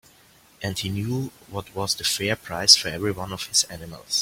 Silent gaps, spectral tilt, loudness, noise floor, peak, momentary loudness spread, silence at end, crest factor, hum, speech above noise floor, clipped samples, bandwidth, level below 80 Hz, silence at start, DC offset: none; -2 dB/octave; -22 LUFS; -55 dBFS; 0 dBFS; 18 LU; 0 s; 26 dB; none; 30 dB; under 0.1%; 16.5 kHz; -54 dBFS; 0.6 s; under 0.1%